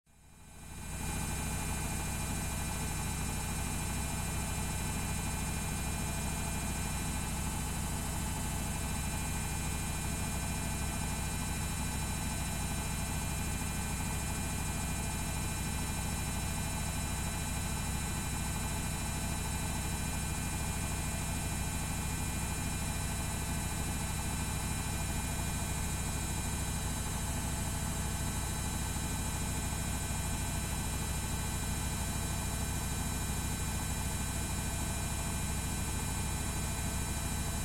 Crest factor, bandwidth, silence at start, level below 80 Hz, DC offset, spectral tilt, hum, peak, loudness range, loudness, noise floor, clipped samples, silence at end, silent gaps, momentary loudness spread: 14 dB; 16.5 kHz; 0.2 s; -40 dBFS; under 0.1%; -3.5 dB/octave; none; -22 dBFS; 0 LU; -36 LUFS; -56 dBFS; under 0.1%; 0 s; none; 1 LU